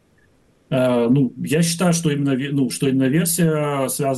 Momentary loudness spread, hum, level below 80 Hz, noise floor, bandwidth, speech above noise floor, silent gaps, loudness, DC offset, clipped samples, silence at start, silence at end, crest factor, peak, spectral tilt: 4 LU; none; -58 dBFS; -57 dBFS; 12.5 kHz; 39 dB; none; -19 LUFS; under 0.1%; under 0.1%; 0.7 s; 0 s; 12 dB; -8 dBFS; -5.5 dB/octave